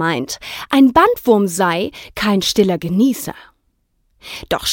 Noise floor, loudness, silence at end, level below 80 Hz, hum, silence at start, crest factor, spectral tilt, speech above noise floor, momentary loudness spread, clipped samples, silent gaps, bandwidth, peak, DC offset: -64 dBFS; -16 LUFS; 0 s; -46 dBFS; none; 0 s; 16 dB; -4.5 dB/octave; 48 dB; 14 LU; under 0.1%; none; 17 kHz; 0 dBFS; under 0.1%